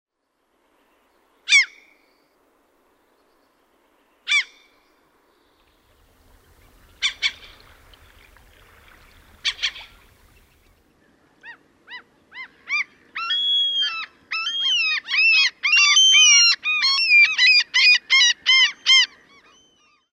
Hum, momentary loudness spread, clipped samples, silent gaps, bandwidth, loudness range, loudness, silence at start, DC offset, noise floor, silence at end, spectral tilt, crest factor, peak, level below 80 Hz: none; 16 LU; under 0.1%; none; 15.5 kHz; 19 LU; -15 LUFS; 1.5 s; under 0.1%; -71 dBFS; 1.05 s; 4.5 dB/octave; 20 dB; -4 dBFS; -62 dBFS